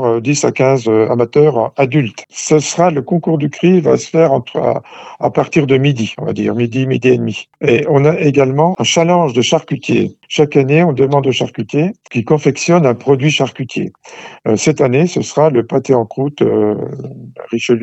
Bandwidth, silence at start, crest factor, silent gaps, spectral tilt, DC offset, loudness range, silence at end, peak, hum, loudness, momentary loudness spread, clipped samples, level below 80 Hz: 8.4 kHz; 0 s; 12 dB; none; -5.5 dB/octave; under 0.1%; 2 LU; 0 s; 0 dBFS; none; -13 LUFS; 10 LU; under 0.1%; -56 dBFS